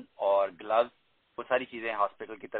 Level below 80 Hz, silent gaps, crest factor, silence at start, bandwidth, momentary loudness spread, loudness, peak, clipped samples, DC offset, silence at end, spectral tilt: -76 dBFS; none; 20 dB; 0 s; 4.3 kHz; 16 LU; -30 LUFS; -12 dBFS; under 0.1%; under 0.1%; 0 s; -1 dB/octave